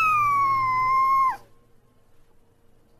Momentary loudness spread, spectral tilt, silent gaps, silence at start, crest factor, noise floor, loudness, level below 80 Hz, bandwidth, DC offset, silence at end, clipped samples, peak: 5 LU; -3.5 dB/octave; none; 0 s; 12 dB; -57 dBFS; -21 LUFS; -54 dBFS; 15 kHz; under 0.1%; 1.6 s; under 0.1%; -14 dBFS